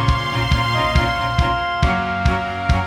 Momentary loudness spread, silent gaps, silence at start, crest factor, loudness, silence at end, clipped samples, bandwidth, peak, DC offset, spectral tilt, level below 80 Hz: 3 LU; none; 0 s; 16 dB; -19 LUFS; 0 s; under 0.1%; 14.5 kHz; -2 dBFS; under 0.1%; -5.5 dB/octave; -24 dBFS